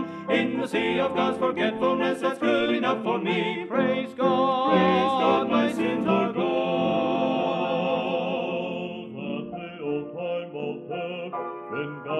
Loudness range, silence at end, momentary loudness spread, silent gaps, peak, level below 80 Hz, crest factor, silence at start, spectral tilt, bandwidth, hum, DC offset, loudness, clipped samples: 8 LU; 0 s; 11 LU; none; -8 dBFS; -68 dBFS; 16 dB; 0 s; -6.5 dB/octave; 12 kHz; none; under 0.1%; -25 LUFS; under 0.1%